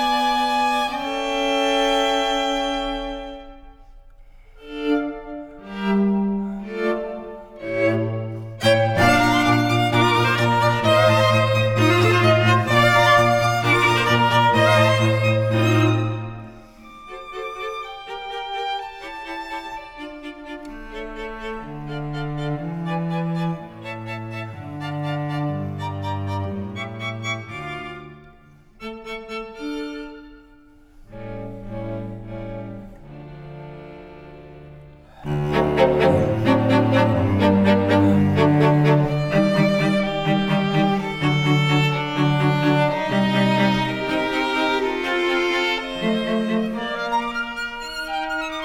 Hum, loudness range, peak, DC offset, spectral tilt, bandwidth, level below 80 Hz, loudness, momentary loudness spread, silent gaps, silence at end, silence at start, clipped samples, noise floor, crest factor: none; 17 LU; -2 dBFS; under 0.1%; -6 dB/octave; 16.5 kHz; -44 dBFS; -20 LUFS; 18 LU; none; 0 s; 0 s; under 0.1%; -49 dBFS; 18 dB